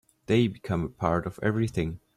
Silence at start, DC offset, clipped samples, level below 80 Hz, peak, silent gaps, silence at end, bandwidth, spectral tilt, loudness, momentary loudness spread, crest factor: 0.3 s; under 0.1%; under 0.1%; -50 dBFS; -8 dBFS; none; 0.2 s; 13 kHz; -7.5 dB/octave; -28 LUFS; 6 LU; 20 dB